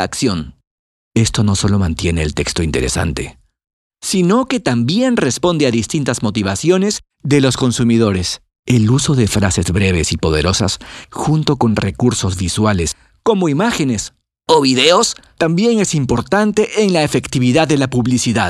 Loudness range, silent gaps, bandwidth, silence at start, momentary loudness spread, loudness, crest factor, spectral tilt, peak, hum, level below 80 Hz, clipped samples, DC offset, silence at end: 3 LU; 0.67-1.11 s, 3.73-3.90 s, 8.59-8.63 s; 14 kHz; 0 s; 7 LU; -15 LUFS; 14 dB; -5 dB/octave; 0 dBFS; none; -34 dBFS; under 0.1%; under 0.1%; 0 s